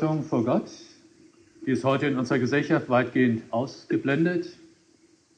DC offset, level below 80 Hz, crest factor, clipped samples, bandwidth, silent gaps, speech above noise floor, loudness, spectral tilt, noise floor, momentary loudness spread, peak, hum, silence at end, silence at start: under 0.1%; -70 dBFS; 16 dB; under 0.1%; 9.2 kHz; none; 36 dB; -25 LUFS; -7 dB/octave; -60 dBFS; 9 LU; -10 dBFS; none; 0.85 s; 0 s